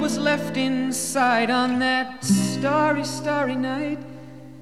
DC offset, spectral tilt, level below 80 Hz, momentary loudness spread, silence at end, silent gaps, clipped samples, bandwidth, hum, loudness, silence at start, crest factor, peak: 0.4%; -4 dB/octave; -60 dBFS; 9 LU; 0 s; none; under 0.1%; 14.5 kHz; none; -22 LUFS; 0 s; 16 dB; -6 dBFS